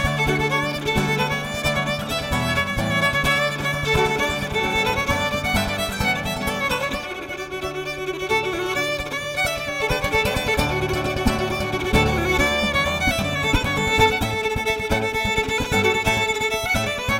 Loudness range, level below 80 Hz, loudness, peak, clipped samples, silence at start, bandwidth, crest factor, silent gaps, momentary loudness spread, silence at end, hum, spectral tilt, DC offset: 4 LU; -34 dBFS; -21 LUFS; -4 dBFS; under 0.1%; 0 s; 16.5 kHz; 18 dB; none; 5 LU; 0 s; none; -4 dB/octave; under 0.1%